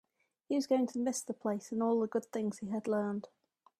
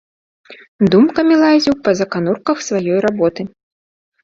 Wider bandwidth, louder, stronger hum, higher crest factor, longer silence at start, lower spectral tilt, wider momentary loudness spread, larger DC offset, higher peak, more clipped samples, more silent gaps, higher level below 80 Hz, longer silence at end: first, 14.5 kHz vs 7.6 kHz; second, -35 LUFS vs -14 LUFS; neither; about the same, 16 dB vs 14 dB; about the same, 0.5 s vs 0.5 s; about the same, -5.5 dB/octave vs -6 dB/octave; about the same, 7 LU vs 7 LU; neither; second, -18 dBFS vs -2 dBFS; neither; second, none vs 0.68-0.79 s; second, -80 dBFS vs -52 dBFS; second, 0.55 s vs 0.75 s